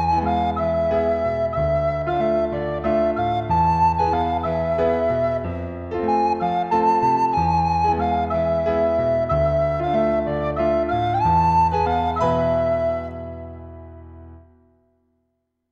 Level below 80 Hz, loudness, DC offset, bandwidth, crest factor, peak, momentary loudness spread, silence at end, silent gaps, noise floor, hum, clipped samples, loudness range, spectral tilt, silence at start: -38 dBFS; -20 LUFS; under 0.1%; 7 kHz; 14 dB; -8 dBFS; 7 LU; 1.35 s; none; -73 dBFS; none; under 0.1%; 3 LU; -8 dB/octave; 0 s